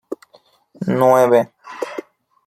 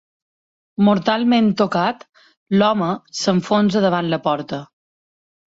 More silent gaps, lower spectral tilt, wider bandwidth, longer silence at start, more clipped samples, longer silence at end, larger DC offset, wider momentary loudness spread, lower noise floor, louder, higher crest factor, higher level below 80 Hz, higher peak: second, none vs 2.37-2.46 s; about the same, -6.5 dB/octave vs -6 dB/octave; first, 15 kHz vs 7.8 kHz; second, 0.1 s vs 0.8 s; neither; second, 0.45 s vs 0.95 s; neither; first, 21 LU vs 9 LU; second, -54 dBFS vs under -90 dBFS; about the same, -16 LUFS vs -18 LUFS; about the same, 18 dB vs 16 dB; about the same, -64 dBFS vs -60 dBFS; first, 0 dBFS vs -4 dBFS